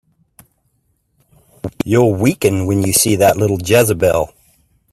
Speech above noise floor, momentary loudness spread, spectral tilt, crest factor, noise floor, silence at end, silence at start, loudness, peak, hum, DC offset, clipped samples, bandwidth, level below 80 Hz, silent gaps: 50 dB; 12 LU; -5 dB/octave; 16 dB; -63 dBFS; 0.65 s; 1.65 s; -14 LUFS; 0 dBFS; none; under 0.1%; under 0.1%; 16 kHz; -46 dBFS; none